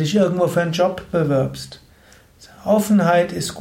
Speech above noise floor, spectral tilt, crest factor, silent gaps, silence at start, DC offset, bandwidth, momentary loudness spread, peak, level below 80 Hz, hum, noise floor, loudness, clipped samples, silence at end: 32 dB; -6 dB/octave; 14 dB; none; 0 s; under 0.1%; 16.5 kHz; 12 LU; -4 dBFS; -50 dBFS; none; -50 dBFS; -18 LUFS; under 0.1%; 0 s